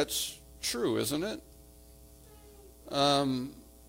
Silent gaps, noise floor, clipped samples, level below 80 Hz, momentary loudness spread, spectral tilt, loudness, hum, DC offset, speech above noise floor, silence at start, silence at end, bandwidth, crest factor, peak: none; -55 dBFS; under 0.1%; -58 dBFS; 15 LU; -3.5 dB/octave; -31 LUFS; none; under 0.1%; 24 dB; 0 s; 0.05 s; 16.5 kHz; 22 dB; -12 dBFS